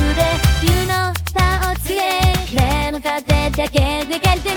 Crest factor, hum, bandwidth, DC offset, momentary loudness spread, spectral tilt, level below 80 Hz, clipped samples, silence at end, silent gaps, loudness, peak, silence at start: 14 dB; none; 19.5 kHz; under 0.1%; 4 LU; -4.5 dB/octave; -22 dBFS; under 0.1%; 0 s; none; -17 LUFS; -2 dBFS; 0 s